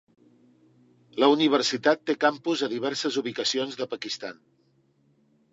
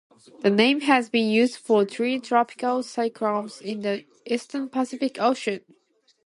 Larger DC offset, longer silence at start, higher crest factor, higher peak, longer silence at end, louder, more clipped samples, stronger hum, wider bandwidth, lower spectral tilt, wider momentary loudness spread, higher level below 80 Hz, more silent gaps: neither; first, 1.15 s vs 0.4 s; about the same, 20 dB vs 18 dB; about the same, -6 dBFS vs -6 dBFS; first, 1.2 s vs 0.65 s; about the same, -25 LUFS vs -24 LUFS; neither; neither; second, 8 kHz vs 11.5 kHz; second, -3.5 dB/octave vs -5 dB/octave; about the same, 12 LU vs 10 LU; about the same, -78 dBFS vs -74 dBFS; neither